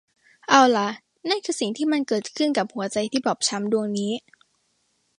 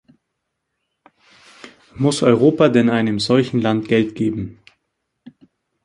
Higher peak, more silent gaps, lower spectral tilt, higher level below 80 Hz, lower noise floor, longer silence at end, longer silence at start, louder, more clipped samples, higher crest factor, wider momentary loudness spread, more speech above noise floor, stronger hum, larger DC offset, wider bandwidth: about the same, -2 dBFS vs -2 dBFS; neither; second, -3.5 dB/octave vs -6 dB/octave; second, -72 dBFS vs -54 dBFS; second, -70 dBFS vs -76 dBFS; second, 1 s vs 1.3 s; second, 0.5 s vs 1.65 s; second, -23 LUFS vs -17 LUFS; neither; about the same, 22 dB vs 18 dB; first, 12 LU vs 9 LU; second, 47 dB vs 60 dB; neither; neither; about the same, 11.5 kHz vs 11 kHz